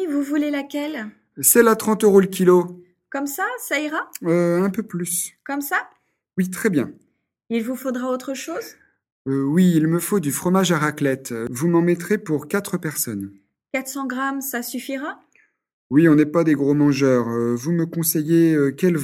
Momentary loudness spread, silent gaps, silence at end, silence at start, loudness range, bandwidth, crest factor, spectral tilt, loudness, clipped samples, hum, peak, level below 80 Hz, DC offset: 13 LU; 9.12-9.25 s, 15.73-15.90 s; 0 s; 0 s; 7 LU; 17 kHz; 20 dB; -5.5 dB/octave; -20 LUFS; under 0.1%; none; 0 dBFS; -62 dBFS; under 0.1%